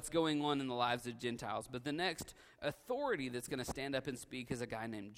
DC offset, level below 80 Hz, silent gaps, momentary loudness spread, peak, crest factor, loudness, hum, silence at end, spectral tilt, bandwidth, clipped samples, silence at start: under 0.1%; -64 dBFS; none; 8 LU; -20 dBFS; 20 dB; -40 LUFS; none; 0 s; -4.5 dB/octave; 16 kHz; under 0.1%; 0 s